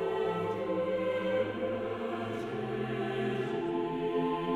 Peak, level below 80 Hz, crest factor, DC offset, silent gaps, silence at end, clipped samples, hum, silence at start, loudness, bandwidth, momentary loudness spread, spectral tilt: -20 dBFS; -62 dBFS; 12 dB; under 0.1%; none; 0 s; under 0.1%; none; 0 s; -33 LUFS; 12 kHz; 4 LU; -7.5 dB/octave